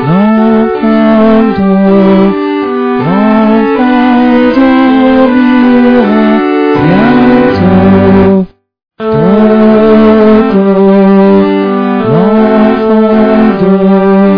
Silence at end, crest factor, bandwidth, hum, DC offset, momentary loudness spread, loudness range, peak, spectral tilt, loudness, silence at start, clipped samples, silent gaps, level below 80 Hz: 0 s; 6 dB; 5.4 kHz; none; 0.8%; 5 LU; 1 LU; 0 dBFS; -10 dB/octave; -6 LUFS; 0 s; 5%; none; -34 dBFS